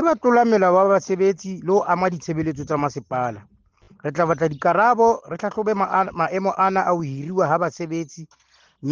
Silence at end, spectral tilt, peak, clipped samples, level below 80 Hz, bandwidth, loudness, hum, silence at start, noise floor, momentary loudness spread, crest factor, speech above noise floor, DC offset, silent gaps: 0 s; -6.5 dB/octave; -6 dBFS; under 0.1%; -58 dBFS; 7.4 kHz; -20 LUFS; none; 0 s; -54 dBFS; 12 LU; 16 dB; 34 dB; under 0.1%; none